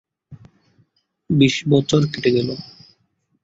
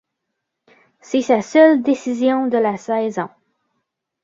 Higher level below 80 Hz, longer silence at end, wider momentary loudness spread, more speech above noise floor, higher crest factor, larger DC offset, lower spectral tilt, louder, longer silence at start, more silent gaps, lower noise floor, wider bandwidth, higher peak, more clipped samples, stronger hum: first, -54 dBFS vs -68 dBFS; second, 0.8 s vs 0.95 s; about the same, 13 LU vs 11 LU; second, 50 dB vs 61 dB; about the same, 20 dB vs 16 dB; neither; about the same, -6 dB/octave vs -5.5 dB/octave; about the same, -18 LUFS vs -17 LUFS; second, 0.3 s vs 1.1 s; neither; second, -67 dBFS vs -78 dBFS; about the same, 8 kHz vs 7.8 kHz; about the same, -2 dBFS vs -2 dBFS; neither; neither